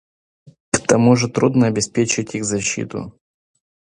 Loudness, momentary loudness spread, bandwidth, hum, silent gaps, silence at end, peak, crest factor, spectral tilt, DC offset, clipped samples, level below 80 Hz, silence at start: -18 LUFS; 12 LU; 11.5 kHz; none; 0.60-0.72 s; 0.85 s; 0 dBFS; 20 dB; -5 dB/octave; under 0.1%; under 0.1%; -52 dBFS; 0.45 s